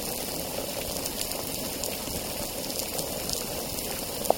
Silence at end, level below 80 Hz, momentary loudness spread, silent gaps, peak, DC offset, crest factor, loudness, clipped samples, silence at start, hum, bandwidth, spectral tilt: 0 s; -48 dBFS; 2 LU; none; -4 dBFS; under 0.1%; 28 dB; -30 LUFS; under 0.1%; 0 s; none; 17 kHz; -2.5 dB/octave